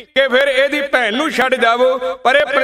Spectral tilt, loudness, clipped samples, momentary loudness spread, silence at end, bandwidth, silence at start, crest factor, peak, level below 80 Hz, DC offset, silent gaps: -2.5 dB/octave; -14 LUFS; under 0.1%; 3 LU; 0 s; 14.5 kHz; 0 s; 14 dB; 0 dBFS; -56 dBFS; 0.1%; none